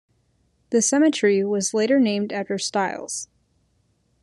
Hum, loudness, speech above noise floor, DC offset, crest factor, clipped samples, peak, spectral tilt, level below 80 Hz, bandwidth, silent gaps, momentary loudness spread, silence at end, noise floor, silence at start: none; -21 LUFS; 45 dB; under 0.1%; 16 dB; under 0.1%; -8 dBFS; -3.5 dB/octave; -70 dBFS; 12.5 kHz; none; 12 LU; 1 s; -66 dBFS; 0.7 s